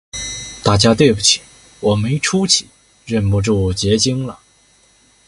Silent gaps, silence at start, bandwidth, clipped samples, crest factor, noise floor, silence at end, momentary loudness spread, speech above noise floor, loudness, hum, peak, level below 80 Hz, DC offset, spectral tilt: none; 0.15 s; 11.5 kHz; under 0.1%; 18 dB; -53 dBFS; 0.9 s; 12 LU; 38 dB; -15 LUFS; none; 0 dBFS; -36 dBFS; under 0.1%; -4 dB/octave